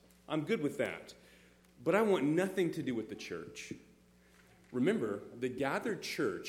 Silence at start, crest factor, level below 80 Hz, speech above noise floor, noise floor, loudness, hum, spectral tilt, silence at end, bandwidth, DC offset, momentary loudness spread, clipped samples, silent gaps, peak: 0.3 s; 20 dB; -72 dBFS; 29 dB; -64 dBFS; -35 LUFS; none; -5.5 dB/octave; 0 s; 16.5 kHz; under 0.1%; 15 LU; under 0.1%; none; -16 dBFS